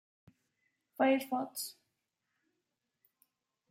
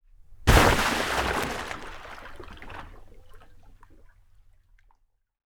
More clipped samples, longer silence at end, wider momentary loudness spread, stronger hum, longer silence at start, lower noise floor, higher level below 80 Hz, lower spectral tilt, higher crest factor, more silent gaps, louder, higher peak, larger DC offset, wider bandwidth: neither; first, 2 s vs 1.75 s; second, 14 LU vs 24 LU; neither; first, 1 s vs 0.3 s; first, -86 dBFS vs -65 dBFS; second, under -90 dBFS vs -34 dBFS; about the same, -3 dB/octave vs -4 dB/octave; second, 20 dB vs 26 dB; neither; second, -34 LUFS vs -24 LUFS; second, -18 dBFS vs -2 dBFS; neither; second, 16 kHz vs over 20 kHz